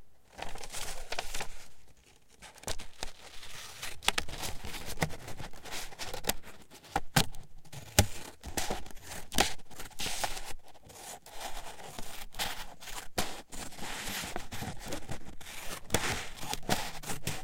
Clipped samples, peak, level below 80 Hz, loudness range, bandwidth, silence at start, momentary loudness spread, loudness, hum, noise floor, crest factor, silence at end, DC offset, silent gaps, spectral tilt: under 0.1%; -4 dBFS; -46 dBFS; 7 LU; 17 kHz; 0 s; 16 LU; -37 LUFS; none; -58 dBFS; 30 dB; 0 s; under 0.1%; none; -2.5 dB/octave